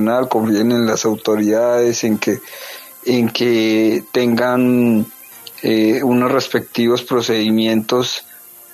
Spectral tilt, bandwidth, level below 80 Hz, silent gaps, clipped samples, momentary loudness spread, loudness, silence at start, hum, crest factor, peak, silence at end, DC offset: -5 dB/octave; 14 kHz; -62 dBFS; none; under 0.1%; 10 LU; -16 LUFS; 0 s; none; 14 dB; -2 dBFS; 0.35 s; under 0.1%